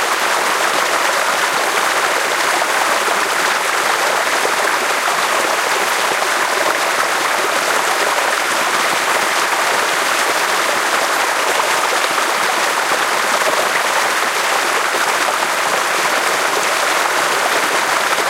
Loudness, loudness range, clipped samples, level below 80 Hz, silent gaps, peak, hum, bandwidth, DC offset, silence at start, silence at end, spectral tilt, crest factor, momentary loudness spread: -15 LUFS; 0 LU; under 0.1%; -66 dBFS; none; -2 dBFS; none; 16 kHz; under 0.1%; 0 s; 0 s; 0 dB/octave; 14 dB; 1 LU